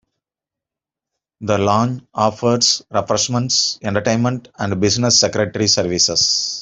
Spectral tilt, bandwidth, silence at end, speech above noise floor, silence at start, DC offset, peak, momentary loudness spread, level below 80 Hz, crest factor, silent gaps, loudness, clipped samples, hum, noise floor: -3 dB/octave; 8.2 kHz; 0 s; 70 dB; 1.4 s; under 0.1%; 0 dBFS; 8 LU; -52 dBFS; 18 dB; none; -16 LUFS; under 0.1%; none; -87 dBFS